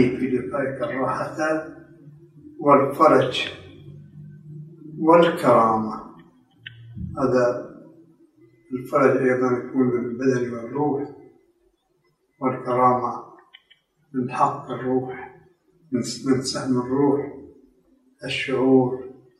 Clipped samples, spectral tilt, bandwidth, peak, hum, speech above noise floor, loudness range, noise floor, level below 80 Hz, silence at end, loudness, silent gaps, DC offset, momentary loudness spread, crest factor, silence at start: under 0.1%; -6 dB/octave; 14 kHz; -2 dBFS; none; 47 dB; 6 LU; -67 dBFS; -62 dBFS; 0.25 s; -22 LUFS; none; under 0.1%; 24 LU; 20 dB; 0 s